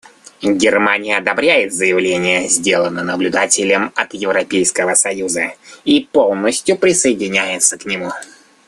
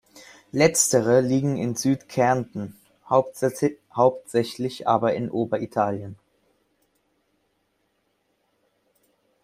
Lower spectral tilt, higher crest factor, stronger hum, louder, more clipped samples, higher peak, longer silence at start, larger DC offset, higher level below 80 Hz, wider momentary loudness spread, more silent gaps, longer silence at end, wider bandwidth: second, -2.5 dB/octave vs -5 dB/octave; second, 16 dB vs 22 dB; neither; first, -14 LUFS vs -23 LUFS; neither; about the same, 0 dBFS vs -2 dBFS; first, 0.4 s vs 0.15 s; neither; about the same, -56 dBFS vs -60 dBFS; second, 7 LU vs 11 LU; neither; second, 0.45 s vs 3.3 s; second, 13 kHz vs 16 kHz